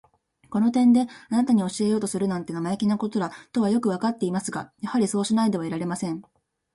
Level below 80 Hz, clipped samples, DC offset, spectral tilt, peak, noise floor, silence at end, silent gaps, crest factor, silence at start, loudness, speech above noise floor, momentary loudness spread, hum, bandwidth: -64 dBFS; under 0.1%; under 0.1%; -6 dB/octave; -10 dBFS; -51 dBFS; 0.55 s; none; 14 dB; 0.5 s; -24 LUFS; 27 dB; 10 LU; none; 11.5 kHz